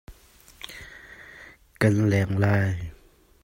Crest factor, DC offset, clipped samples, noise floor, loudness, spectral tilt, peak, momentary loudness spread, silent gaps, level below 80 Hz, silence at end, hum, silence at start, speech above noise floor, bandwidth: 20 dB; under 0.1%; under 0.1%; -53 dBFS; -23 LUFS; -7 dB/octave; -8 dBFS; 22 LU; none; -50 dBFS; 0.5 s; none; 0.1 s; 32 dB; 16 kHz